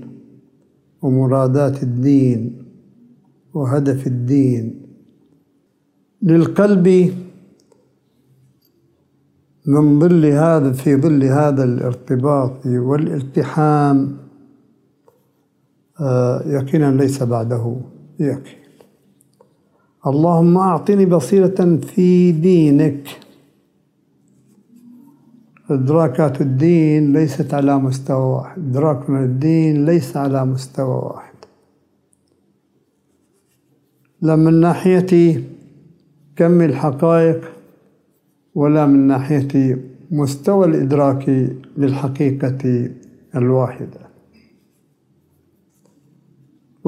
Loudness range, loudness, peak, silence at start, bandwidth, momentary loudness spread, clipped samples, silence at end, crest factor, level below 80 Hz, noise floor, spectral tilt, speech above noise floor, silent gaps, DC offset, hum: 7 LU; -15 LUFS; 0 dBFS; 0 s; 14 kHz; 11 LU; under 0.1%; 2.95 s; 16 dB; -62 dBFS; -62 dBFS; -9 dB/octave; 48 dB; none; under 0.1%; none